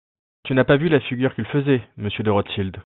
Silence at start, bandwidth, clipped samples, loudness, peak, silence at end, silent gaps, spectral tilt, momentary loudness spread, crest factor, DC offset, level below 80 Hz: 0.45 s; 4.2 kHz; under 0.1%; -21 LUFS; -2 dBFS; 0.05 s; none; -10.5 dB/octave; 9 LU; 20 dB; under 0.1%; -52 dBFS